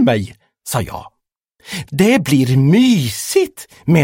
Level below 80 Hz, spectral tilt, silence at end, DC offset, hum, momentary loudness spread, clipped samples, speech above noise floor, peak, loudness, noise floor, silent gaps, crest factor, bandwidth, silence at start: -46 dBFS; -6 dB/octave; 0 s; under 0.1%; none; 16 LU; under 0.1%; 50 dB; 0 dBFS; -15 LUFS; -64 dBFS; none; 14 dB; 17 kHz; 0 s